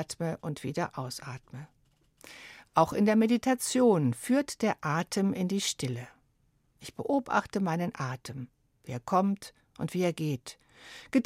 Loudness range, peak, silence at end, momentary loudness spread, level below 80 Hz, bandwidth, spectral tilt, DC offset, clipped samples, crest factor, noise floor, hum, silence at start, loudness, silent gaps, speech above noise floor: 6 LU; -10 dBFS; 0 s; 23 LU; -66 dBFS; 16 kHz; -5.5 dB/octave; under 0.1%; under 0.1%; 22 dB; -70 dBFS; none; 0 s; -30 LUFS; none; 41 dB